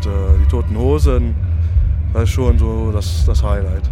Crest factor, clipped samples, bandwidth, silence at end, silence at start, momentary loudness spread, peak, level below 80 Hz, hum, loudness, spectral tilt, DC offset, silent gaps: 12 dB; under 0.1%; 11.5 kHz; 0 s; 0 s; 4 LU; -2 dBFS; -16 dBFS; none; -16 LUFS; -7.5 dB/octave; under 0.1%; none